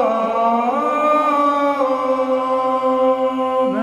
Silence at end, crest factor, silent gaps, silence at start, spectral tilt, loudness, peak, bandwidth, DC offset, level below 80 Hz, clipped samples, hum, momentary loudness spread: 0 s; 12 dB; none; 0 s; -5.5 dB/octave; -17 LUFS; -6 dBFS; 12.5 kHz; under 0.1%; -60 dBFS; under 0.1%; none; 3 LU